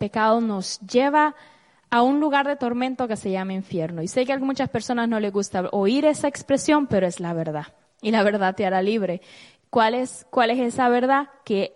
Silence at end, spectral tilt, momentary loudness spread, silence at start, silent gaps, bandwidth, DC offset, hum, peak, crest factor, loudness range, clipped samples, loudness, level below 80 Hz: 0.05 s; -5 dB/octave; 8 LU; 0 s; none; 11.5 kHz; under 0.1%; none; -6 dBFS; 16 dB; 2 LU; under 0.1%; -22 LUFS; -62 dBFS